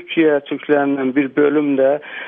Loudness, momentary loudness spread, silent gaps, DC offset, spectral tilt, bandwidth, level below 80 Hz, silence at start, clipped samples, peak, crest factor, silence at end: -17 LUFS; 3 LU; none; under 0.1%; -9.5 dB/octave; 3.8 kHz; -68 dBFS; 0 s; under 0.1%; -2 dBFS; 14 dB; 0 s